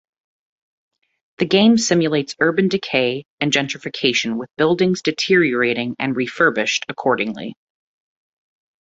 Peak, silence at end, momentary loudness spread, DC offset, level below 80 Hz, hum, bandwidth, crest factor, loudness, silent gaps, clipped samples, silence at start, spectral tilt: -2 dBFS; 1.3 s; 8 LU; under 0.1%; -60 dBFS; none; 8 kHz; 18 dB; -18 LUFS; 3.25-3.38 s; under 0.1%; 1.4 s; -4 dB/octave